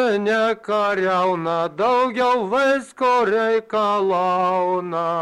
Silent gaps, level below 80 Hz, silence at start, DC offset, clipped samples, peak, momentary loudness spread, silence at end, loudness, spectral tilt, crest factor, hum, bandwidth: none; -62 dBFS; 0 s; under 0.1%; under 0.1%; -10 dBFS; 3 LU; 0 s; -19 LUFS; -5.5 dB/octave; 10 dB; none; 12 kHz